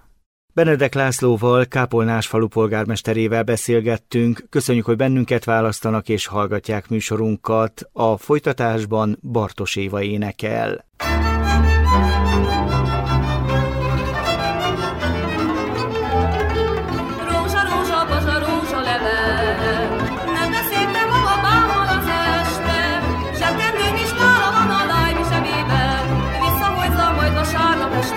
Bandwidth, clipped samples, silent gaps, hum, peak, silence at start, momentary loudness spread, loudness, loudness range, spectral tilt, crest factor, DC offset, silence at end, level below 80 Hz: 16.5 kHz; under 0.1%; none; none; -4 dBFS; 0.55 s; 6 LU; -19 LUFS; 3 LU; -5.5 dB/octave; 14 dB; under 0.1%; 0 s; -28 dBFS